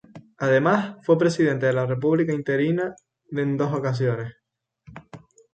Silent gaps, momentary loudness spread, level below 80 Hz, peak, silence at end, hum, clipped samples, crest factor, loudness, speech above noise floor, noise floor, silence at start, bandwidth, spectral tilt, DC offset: none; 12 LU; -64 dBFS; -8 dBFS; 0.35 s; none; under 0.1%; 16 dB; -23 LUFS; 33 dB; -55 dBFS; 0.15 s; 9 kHz; -7.5 dB/octave; under 0.1%